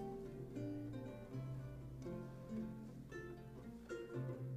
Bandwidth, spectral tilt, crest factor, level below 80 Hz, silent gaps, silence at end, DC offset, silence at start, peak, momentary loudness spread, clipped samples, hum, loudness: 15 kHz; -8 dB/octave; 14 dB; -64 dBFS; none; 0 s; under 0.1%; 0 s; -36 dBFS; 6 LU; under 0.1%; none; -50 LUFS